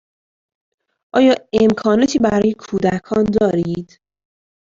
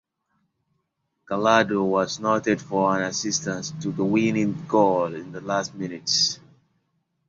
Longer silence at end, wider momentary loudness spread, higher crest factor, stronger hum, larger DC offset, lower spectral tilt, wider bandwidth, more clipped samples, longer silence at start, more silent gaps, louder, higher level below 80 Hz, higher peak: about the same, 0.85 s vs 0.9 s; second, 7 LU vs 10 LU; about the same, 16 dB vs 20 dB; neither; neither; first, -6 dB/octave vs -4 dB/octave; about the same, 7.8 kHz vs 7.8 kHz; neither; second, 1.15 s vs 1.3 s; neither; first, -16 LUFS vs -23 LUFS; first, -48 dBFS vs -62 dBFS; about the same, -2 dBFS vs -4 dBFS